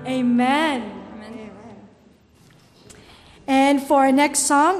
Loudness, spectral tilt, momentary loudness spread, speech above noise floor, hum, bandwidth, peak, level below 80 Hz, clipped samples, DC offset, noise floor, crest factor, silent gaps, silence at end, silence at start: -18 LUFS; -3 dB/octave; 21 LU; 35 dB; none; 15 kHz; -6 dBFS; -58 dBFS; under 0.1%; under 0.1%; -53 dBFS; 14 dB; none; 0 s; 0 s